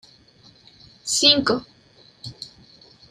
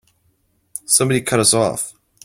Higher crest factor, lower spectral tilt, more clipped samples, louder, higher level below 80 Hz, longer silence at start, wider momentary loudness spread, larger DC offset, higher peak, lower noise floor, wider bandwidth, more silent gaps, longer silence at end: about the same, 24 dB vs 20 dB; second, -1.5 dB/octave vs -3 dB/octave; neither; about the same, -18 LUFS vs -16 LUFS; second, -60 dBFS vs -54 dBFS; first, 1.05 s vs 0.75 s; first, 25 LU vs 17 LU; neither; about the same, 0 dBFS vs 0 dBFS; second, -54 dBFS vs -63 dBFS; about the same, 15 kHz vs 16.5 kHz; neither; first, 0.65 s vs 0.35 s